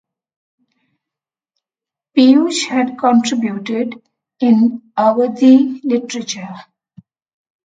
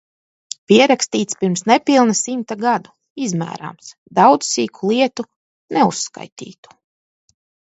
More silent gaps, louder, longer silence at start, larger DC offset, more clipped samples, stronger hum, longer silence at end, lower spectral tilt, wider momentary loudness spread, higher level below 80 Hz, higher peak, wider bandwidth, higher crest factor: second, none vs 3.10-3.16 s, 3.98-4.06 s, 5.36-5.68 s, 6.32-6.36 s; first, -14 LUFS vs -17 LUFS; first, 2.15 s vs 0.7 s; neither; neither; neither; about the same, 1.05 s vs 1.15 s; about the same, -4.5 dB/octave vs -4 dB/octave; second, 14 LU vs 20 LU; about the same, -68 dBFS vs -66 dBFS; about the same, 0 dBFS vs 0 dBFS; first, 9.2 kHz vs 8.2 kHz; about the same, 16 dB vs 18 dB